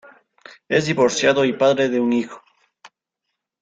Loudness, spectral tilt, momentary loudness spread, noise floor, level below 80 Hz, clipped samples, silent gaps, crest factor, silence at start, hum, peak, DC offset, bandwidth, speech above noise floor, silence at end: -18 LUFS; -4.5 dB/octave; 5 LU; -80 dBFS; -62 dBFS; under 0.1%; none; 18 dB; 0.7 s; none; -4 dBFS; under 0.1%; 9.2 kHz; 62 dB; 0.75 s